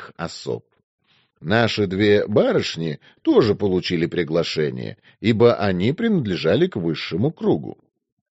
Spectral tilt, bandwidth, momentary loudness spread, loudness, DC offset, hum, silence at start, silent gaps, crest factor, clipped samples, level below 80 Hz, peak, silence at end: -5 dB/octave; 8 kHz; 13 LU; -20 LUFS; under 0.1%; none; 0 s; 0.84-0.98 s; 18 dB; under 0.1%; -56 dBFS; -2 dBFS; 0.55 s